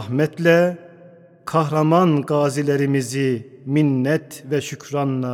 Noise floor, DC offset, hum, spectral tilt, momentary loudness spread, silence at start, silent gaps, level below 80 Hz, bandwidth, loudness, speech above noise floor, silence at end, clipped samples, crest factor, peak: -46 dBFS; under 0.1%; none; -6.5 dB/octave; 9 LU; 0 s; none; -68 dBFS; 16 kHz; -20 LUFS; 28 dB; 0 s; under 0.1%; 18 dB; -2 dBFS